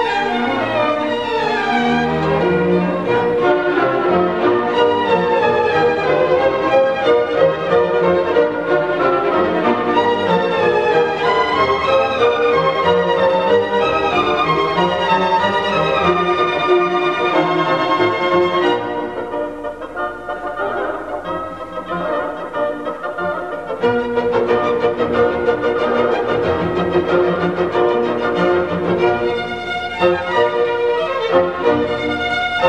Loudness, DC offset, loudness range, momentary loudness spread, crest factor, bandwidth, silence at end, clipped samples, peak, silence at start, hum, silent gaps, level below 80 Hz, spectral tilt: -16 LUFS; 0.3%; 6 LU; 8 LU; 16 dB; 9 kHz; 0 s; under 0.1%; -2 dBFS; 0 s; none; none; -46 dBFS; -6 dB/octave